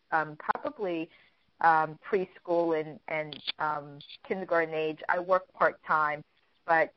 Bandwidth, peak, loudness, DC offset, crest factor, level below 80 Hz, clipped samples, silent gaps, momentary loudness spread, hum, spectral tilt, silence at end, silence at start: 6 kHz; -10 dBFS; -30 LUFS; under 0.1%; 20 dB; -74 dBFS; under 0.1%; none; 11 LU; none; -2.5 dB/octave; 0.05 s; 0.1 s